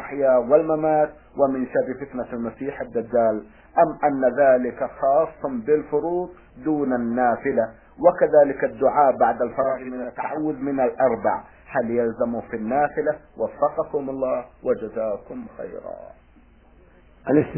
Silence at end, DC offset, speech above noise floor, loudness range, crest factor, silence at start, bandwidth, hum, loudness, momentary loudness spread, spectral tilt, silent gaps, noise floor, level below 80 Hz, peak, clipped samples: 0 s; under 0.1%; 31 dB; 7 LU; 20 dB; 0 s; 3.1 kHz; none; -22 LUFS; 13 LU; -12 dB/octave; none; -52 dBFS; -54 dBFS; -4 dBFS; under 0.1%